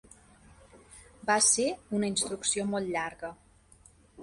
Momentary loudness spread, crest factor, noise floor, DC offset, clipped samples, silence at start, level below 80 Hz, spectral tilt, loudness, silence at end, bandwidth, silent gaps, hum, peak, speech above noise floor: 15 LU; 22 dB; -59 dBFS; under 0.1%; under 0.1%; 0.75 s; -62 dBFS; -2 dB/octave; -28 LUFS; 0 s; 11.5 kHz; none; none; -10 dBFS; 30 dB